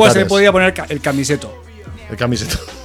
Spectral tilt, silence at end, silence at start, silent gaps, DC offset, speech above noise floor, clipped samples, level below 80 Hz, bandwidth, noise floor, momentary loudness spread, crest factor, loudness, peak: -4.5 dB/octave; 0 s; 0 s; none; under 0.1%; 19 dB; under 0.1%; -36 dBFS; 19 kHz; -33 dBFS; 23 LU; 16 dB; -15 LUFS; 0 dBFS